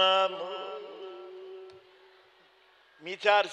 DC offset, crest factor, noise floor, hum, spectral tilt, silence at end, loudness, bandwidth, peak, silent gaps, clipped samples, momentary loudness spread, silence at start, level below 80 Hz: under 0.1%; 22 dB; -62 dBFS; none; -2 dB/octave; 0 s; -29 LUFS; 8.8 kHz; -10 dBFS; none; under 0.1%; 22 LU; 0 s; under -90 dBFS